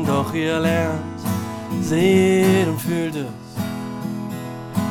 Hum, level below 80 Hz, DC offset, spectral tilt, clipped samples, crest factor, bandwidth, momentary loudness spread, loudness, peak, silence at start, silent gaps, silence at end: none; -60 dBFS; under 0.1%; -6 dB/octave; under 0.1%; 16 dB; 18 kHz; 13 LU; -21 LUFS; -4 dBFS; 0 s; none; 0 s